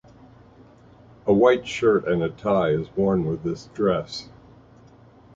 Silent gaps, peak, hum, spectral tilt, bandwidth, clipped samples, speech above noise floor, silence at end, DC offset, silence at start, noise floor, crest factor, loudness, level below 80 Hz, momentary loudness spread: none; -4 dBFS; none; -7 dB/octave; 7.8 kHz; under 0.1%; 29 dB; 1.1 s; under 0.1%; 1.25 s; -50 dBFS; 20 dB; -22 LUFS; -52 dBFS; 12 LU